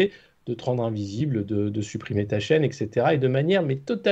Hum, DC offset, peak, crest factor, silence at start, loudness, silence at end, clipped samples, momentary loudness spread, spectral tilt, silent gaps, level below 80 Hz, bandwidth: none; under 0.1%; -8 dBFS; 16 dB; 0 s; -25 LUFS; 0 s; under 0.1%; 8 LU; -7 dB/octave; none; -60 dBFS; 8.2 kHz